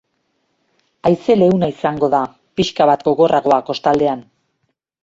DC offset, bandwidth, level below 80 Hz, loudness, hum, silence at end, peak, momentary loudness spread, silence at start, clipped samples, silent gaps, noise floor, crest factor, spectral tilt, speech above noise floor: under 0.1%; 7.8 kHz; -52 dBFS; -16 LUFS; none; 0.85 s; 0 dBFS; 7 LU; 1.05 s; under 0.1%; none; -70 dBFS; 16 dB; -6.5 dB/octave; 55 dB